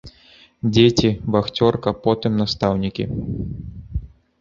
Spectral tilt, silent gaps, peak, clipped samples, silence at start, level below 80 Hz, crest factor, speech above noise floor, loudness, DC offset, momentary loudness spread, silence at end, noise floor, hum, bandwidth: -6.5 dB/octave; none; -2 dBFS; under 0.1%; 0.05 s; -38 dBFS; 18 dB; 32 dB; -20 LUFS; under 0.1%; 16 LU; 0.35 s; -50 dBFS; none; 7.6 kHz